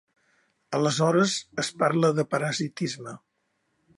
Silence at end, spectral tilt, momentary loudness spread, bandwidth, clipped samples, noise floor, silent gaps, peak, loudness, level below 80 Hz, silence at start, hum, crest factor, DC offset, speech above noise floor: 0.8 s; -5 dB/octave; 10 LU; 11.5 kHz; under 0.1%; -74 dBFS; none; -8 dBFS; -25 LUFS; -72 dBFS; 0.7 s; none; 18 dB; under 0.1%; 49 dB